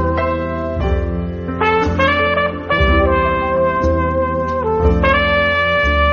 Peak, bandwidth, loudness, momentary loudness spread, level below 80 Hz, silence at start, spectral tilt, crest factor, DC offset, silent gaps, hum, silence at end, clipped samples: 0 dBFS; 6.8 kHz; -16 LUFS; 7 LU; -24 dBFS; 0 s; -4 dB/octave; 14 dB; under 0.1%; none; none; 0 s; under 0.1%